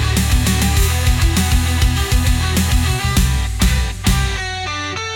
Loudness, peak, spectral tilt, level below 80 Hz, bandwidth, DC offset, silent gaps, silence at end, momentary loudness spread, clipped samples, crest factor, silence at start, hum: -17 LUFS; -2 dBFS; -4 dB/octave; -18 dBFS; 17.5 kHz; under 0.1%; none; 0 s; 5 LU; under 0.1%; 12 dB; 0 s; none